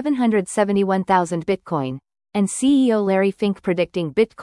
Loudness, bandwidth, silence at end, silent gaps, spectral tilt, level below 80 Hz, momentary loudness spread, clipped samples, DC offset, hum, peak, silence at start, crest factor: -20 LUFS; 12 kHz; 0 s; none; -6 dB/octave; -58 dBFS; 8 LU; under 0.1%; under 0.1%; none; -4 dBFS; 0 s; 16 dB